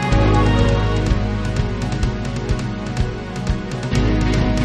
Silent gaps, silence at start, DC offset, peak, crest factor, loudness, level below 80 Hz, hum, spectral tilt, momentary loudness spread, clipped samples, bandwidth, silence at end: none; 0 s; under 0.1%; -4 dBFS; 14 dB; -20 LUFS; -22 dBFS; none; -6.5 dB/octave; 9 LU; under 0.1%; 9.6 kHz; 0 s